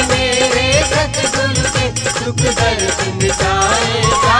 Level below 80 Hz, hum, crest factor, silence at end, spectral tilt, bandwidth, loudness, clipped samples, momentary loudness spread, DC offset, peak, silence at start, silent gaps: -28 dBFS; none; 14 dB; 0 s; -3 dB/octave; 10 kHz; -14 LUFS; under 0.1%; 4 LU; under 0.1%; 0 dBFS; 0 s; none